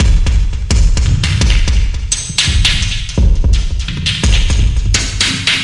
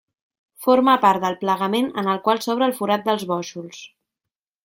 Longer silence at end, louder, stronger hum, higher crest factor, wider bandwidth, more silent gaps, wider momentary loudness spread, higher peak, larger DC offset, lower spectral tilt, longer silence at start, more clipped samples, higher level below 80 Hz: second, 0 s vs 0.75 s; first, -14 LUFS vs -20 LUFS; neither; second, 10 dB vs 18 dB; second, 11.5 kHz vs 16.5 kHz; neither; second, 5 LU vs 15 LU; about the same, 0 dBFS vs -2 dBFS; neither; second, -3 dB/octave vs -5 dB/octave; second, 0 s vs 0.6 s; neither; first, -12 dBFS vs -68 dBFS